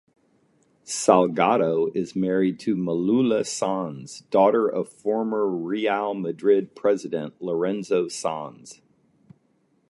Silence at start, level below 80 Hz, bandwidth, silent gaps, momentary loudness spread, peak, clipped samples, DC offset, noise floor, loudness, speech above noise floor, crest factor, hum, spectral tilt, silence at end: 0.85 s; -70 dBFS; 11.5 kHz; none; 10 LU; -2 dBFS; under 0.1%; under 0.1%; -66 dBFS; -23 LUFS; 43 dB; 22 dB; none; -5.5 dB/octave; 1.15 s